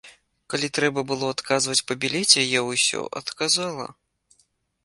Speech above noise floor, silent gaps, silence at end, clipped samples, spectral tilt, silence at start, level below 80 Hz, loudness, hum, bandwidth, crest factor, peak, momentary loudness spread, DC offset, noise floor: 43 dB; none; 0.9 s; under 0.1%; -2 dB/octave; 0.05 s; -66 dBFS; -22 LUFS; none; 11.5 kHz; 24 dB; 0 dBFS; 14 LU; under 0.1%; -67 dBFS